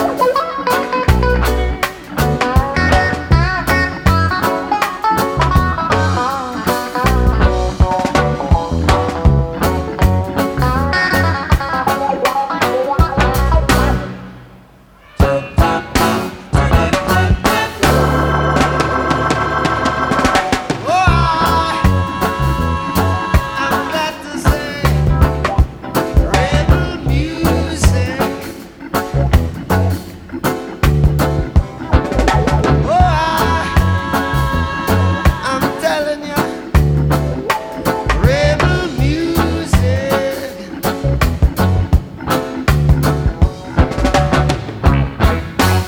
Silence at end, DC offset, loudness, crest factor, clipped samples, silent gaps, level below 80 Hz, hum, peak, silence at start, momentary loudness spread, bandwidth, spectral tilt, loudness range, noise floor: 0 s; under 0.1%; -15 LUFS; 14 dB; under 0.1%; none; -20 dBFS; none; 0 dBFS; 0 s; 5 LU; 19.5 kHz; -6 dB/octave; 2 LU; -43 dBFS